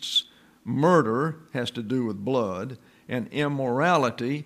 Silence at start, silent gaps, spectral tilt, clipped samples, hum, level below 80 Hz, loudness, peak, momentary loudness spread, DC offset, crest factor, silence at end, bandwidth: 0 s; none; -5.5 dB/octave; under 0.1%; none; -68 dBFS; -25 LUFS; -8 dBFS; 13 LU; under 0.1%; 18 dB; 0 s; 15.5 kHz